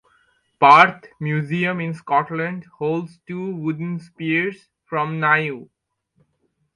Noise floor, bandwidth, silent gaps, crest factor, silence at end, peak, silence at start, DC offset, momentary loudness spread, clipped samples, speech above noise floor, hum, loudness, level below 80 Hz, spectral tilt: -69 dBFS; 10.5 kHz; none; 22 dB; 1.1 s; 0 dBFS; 0.6 s; under 0.1%; 17 LU; under 0.1%; 49 dB; none; -20 LUFS; -66 dBFS; -7 dB/octave